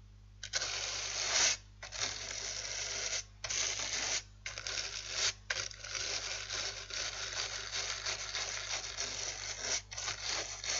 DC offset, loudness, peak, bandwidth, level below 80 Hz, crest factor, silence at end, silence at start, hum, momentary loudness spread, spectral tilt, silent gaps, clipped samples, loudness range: under 0.1%; -36 LUFS; -16 dBFS; 11.5 kHz; -58 dBFS; 22 dB; 0 s; 0 s; 50 Hz at -55 dBFS; 5 LU; 0.5 dB/octave; none; under 0.1%; 3 LU